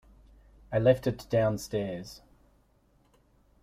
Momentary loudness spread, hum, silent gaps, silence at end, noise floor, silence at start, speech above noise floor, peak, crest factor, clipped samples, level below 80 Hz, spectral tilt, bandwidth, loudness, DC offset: 18 LU; 50 Hz at -55 dBFS; none; 1.45 s; -66 dBFS; 0.7 s; 38 dB; -8 dBFS; 22 dB; under 0.1%; -56 dBFS; -6.5 dB/octave; 15.5 kHz; -29 LUFS; under 0.1%